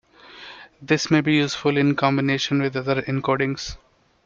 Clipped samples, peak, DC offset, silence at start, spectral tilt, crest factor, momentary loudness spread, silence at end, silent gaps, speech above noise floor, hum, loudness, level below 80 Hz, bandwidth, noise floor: under 0.1%; -6 dBFS; under 0.1%; 0.3 s; -5.5 dB/octave; 16 dB; 21 LU; 0.5 s; none; 23 dB; none; -21 LUFS; -52 dBFS; 7.6 kHz; -44 dBFS